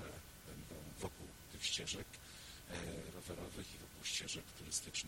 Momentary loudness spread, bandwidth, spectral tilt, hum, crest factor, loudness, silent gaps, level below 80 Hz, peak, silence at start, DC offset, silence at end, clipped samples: 13 LU; 16.5 kHz; -2 dB/octave; none; 24 dB; -46 LUFS; none; -62 dBFS; -24 dBFS; 0 s; under 0.1%; 0 s; under 0.1%